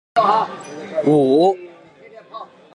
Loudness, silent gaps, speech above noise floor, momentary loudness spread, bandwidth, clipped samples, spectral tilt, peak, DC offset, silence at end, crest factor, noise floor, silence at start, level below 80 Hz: -17 LUFS; none; 28 dB; 22 LU; 11 kHz; under 0.1%; -7 dB/octave; -4 dBFS; under 0.1%; 0.3 s; 16 dB; -43 dBFS; 0.15 s; -66 dBFS